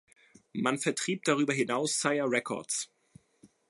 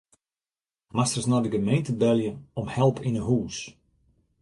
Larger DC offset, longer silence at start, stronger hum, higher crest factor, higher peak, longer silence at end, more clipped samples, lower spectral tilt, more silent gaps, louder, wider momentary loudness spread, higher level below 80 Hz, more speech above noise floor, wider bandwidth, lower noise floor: neither; second, 0.55 s vs 0.95 s; neither; about the same, 22 dB vs 18 dB; about the same, -10 dBFS vs -8 dBFS; second, 0.25 s vs 0.7 s; neither; second, -3.5 dB/octave vs -6 dB/octave; neither; second, -30 LUFS vs -26 LUFS; second, 6 LU vs 11 LU; second, -80 dBFS vs -54 dBFS; second, 33 dB vs over 65 dB; about the same, 11.5 kHz vs 11.5 kHz; second, -63 dBFS vs under -90 dBFS